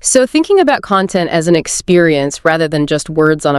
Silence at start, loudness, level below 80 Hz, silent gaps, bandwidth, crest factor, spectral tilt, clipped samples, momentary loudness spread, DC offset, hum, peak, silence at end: 0.05 s; -12 LUFS; -44 dBFS; none; 13 kHz; 12 dB; -4.5 dB/octave; under 0.1%; 4 LU; under 0.1%; none; 0 dBFS; 0 s